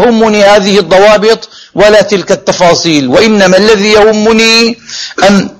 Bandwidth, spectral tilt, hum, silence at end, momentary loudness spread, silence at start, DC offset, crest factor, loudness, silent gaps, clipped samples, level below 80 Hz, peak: 16 kHz; -4 dB/octave; none; 0.1 s; 6 LU; 0 s; under 0.1%; 6 dB; -5 LUFS; none; 6%; -38 dBFS; 0 dBFS